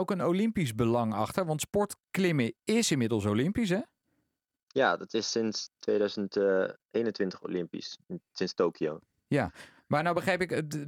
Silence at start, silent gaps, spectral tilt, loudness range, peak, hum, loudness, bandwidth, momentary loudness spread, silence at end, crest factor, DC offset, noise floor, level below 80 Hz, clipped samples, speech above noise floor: 0 s; 4.63-4.67 s, 6.85-6.89 s; -5 dB/octave; 3 LU; -12 dBFS; none; -30 LUFS; 17.5 kHz; 8 LU; 0 s; 18 dB; under 0.1%; -83 dBFS; -62 dBFS; under 0.1%; 54 dB